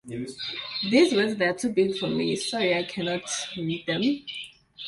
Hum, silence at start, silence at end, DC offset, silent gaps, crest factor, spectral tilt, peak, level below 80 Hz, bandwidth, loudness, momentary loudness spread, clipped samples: none; 0.05 s; 0 s; under 0.1%; none; 18 dB; -4 dB/octave; -8 dBFS; -64 dBFS; 11.5 kHz; -26 LUFS; 12 LU; under 0.1%